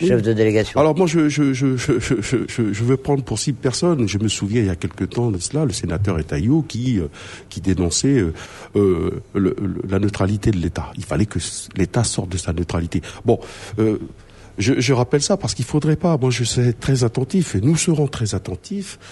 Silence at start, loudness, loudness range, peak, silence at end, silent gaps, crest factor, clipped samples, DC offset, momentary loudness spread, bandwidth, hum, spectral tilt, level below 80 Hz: 0 s; -20 LUFS; 3 LU; -2 dBFS; 0 s; none; 16 dB; under 0.1%; under 0.1%; 8 LU; 11.5 kHz; none; -5.5 dB/octave; -40 dBFS